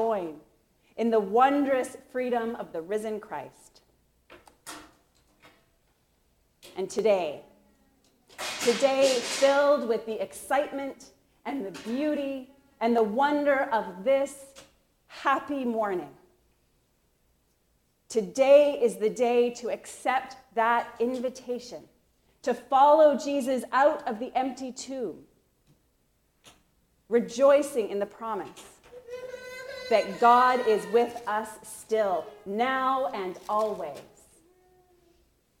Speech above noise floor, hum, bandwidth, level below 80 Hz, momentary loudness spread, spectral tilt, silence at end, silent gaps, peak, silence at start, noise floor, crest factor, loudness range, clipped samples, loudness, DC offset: 44 dB; none; 16 kHz; -70 dBFS; 18 LU; -4 dB/octave; 1.6 s; none; -8 dBFS; 0 s; -70 dBFS; 20 dB; 9 LU; under 0.1%; -26 LUFS; under 0.1%